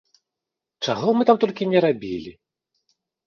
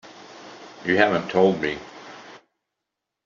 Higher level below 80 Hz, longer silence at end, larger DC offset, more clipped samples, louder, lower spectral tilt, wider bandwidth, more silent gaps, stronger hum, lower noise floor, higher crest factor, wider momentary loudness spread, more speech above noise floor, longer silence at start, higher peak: about the same, -62 dBFS vs -62 dBFS; about the same, 0.95 s vs 0.9 s; neither; neither; about the same, -21 LUFS vs -21 LUFS; first, -6.5 dB/octave vs -3.5 dB/octave; about the same, 7 kHz vs 7.4 kHz; neither; neither; about the same, -86 dBFS vs -83 dBFS; about the same, 20 dB vs 22 dB; second, 14 LU vs 23 LU; about the same, 66 dB vs 63 dB; first, 0.8 s vs 0.05 s; about the same, -4 dBFS vs -4 dBFS